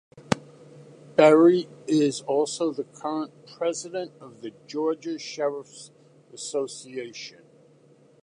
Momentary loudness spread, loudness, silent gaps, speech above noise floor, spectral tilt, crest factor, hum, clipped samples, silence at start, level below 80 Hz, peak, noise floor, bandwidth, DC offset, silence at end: 21 LU; -25 LUFS; none; 32 dB; -5 dB/octave; 22 dB; none; under 0.1%; 0.15 s; -68 dBFS; -4 dBFS; -57 dBFS; 11 kHz; under 0.1%; 0.95 s